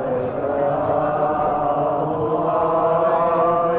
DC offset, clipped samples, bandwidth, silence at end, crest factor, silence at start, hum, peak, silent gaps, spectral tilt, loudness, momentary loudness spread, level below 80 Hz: under 0.1%; under 0.1%; 4 kHz; 0 s; 12 dB; 0 s; none; -8 dBFS; none; -11 dB/octave; -20 LUFS; 4 LU; -48 dBFS